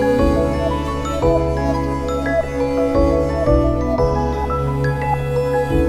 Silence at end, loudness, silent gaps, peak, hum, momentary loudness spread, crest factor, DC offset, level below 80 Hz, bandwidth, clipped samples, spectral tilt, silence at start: 0 s; -18 LUFS; none; -2 dBFS; none; 4 LU; 14 dB; under 0.1%; -26 dBFS; 14 kHz; under 0.1%; -7.5 dB/octave; 0 s